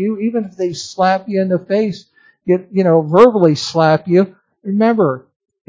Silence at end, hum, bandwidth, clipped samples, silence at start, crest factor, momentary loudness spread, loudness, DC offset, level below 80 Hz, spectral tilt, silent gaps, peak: 0.5 s; none; 8 kHz; 0.2%; 0 s; 14 dB; 12 LU; -15 LUFS; under 0.1%; -60 dBFS; -6.5 dB/octave; none; 0 dBFS